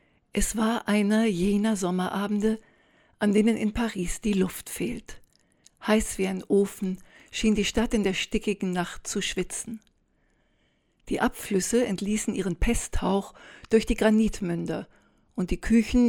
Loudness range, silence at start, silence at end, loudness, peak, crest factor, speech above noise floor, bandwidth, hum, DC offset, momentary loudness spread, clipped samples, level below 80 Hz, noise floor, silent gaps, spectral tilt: 4 LU; 0.35 s; 0 s; -26 LUFS; -8 dBFS; 18 dB; 43 dB; 18.5 kHz; none; under 0.1%; 11 LU; under 0.1%; -40 dBFS; -68 dBFS; none; -5 dB/octave